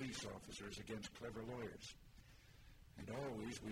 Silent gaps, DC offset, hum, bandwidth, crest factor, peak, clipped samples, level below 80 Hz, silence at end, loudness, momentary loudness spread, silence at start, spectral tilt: none; under 0.1%; none; 16 kHz; 16 dB; -36 dBFS; under 0.1%; -66 dBFS; 0 s; -51 LUFS; 18 LU; 0 s; -4.5 dB/octave